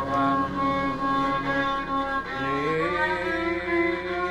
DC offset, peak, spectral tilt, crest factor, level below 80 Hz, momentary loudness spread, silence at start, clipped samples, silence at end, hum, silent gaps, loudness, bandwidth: under 0.1%; -12 dBFS; -6 dB/octave; 14 dB; -46 dBFS; 3 LU; 0 s; under 0.1%; 0 s; none; none; -25 LUFS; 12 kHz